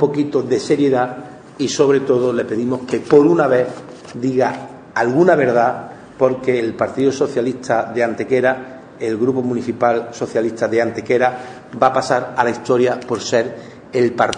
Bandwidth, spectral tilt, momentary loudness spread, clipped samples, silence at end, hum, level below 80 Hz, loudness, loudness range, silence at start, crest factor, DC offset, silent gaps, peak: 10 kHz; -5.5 dB/octave; 12 LU; under 0.1%; 0 s; none; -56 dBFS; -17 LUFS; 3 LU; 0 s; 16 dB; under 0.1%; none; 0 dBFS